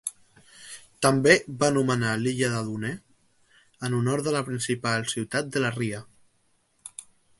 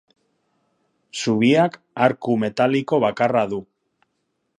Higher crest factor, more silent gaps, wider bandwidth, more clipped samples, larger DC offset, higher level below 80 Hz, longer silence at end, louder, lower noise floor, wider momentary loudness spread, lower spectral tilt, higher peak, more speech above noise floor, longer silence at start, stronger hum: about the same, 24 dB vs 20 dB; neither; about the same, 12 kHz vs 11.5 kHz; neither; neither; about the same, -60 dBFS vs -64 dBFS; second, 0.4 s vs 0.95 s; second, -25 LUFS vs -20 LUFS; second, -68 dBFS vs -73 dBFS; first, 22 LU vs 10 LU; second, -4.5 dB/octave vs -6 dB/octave; about the same, -4 dBFS vs -2 dBFS; second, 43 dB vs 54 dB; second, 0.05 s vs 1.15 s; neither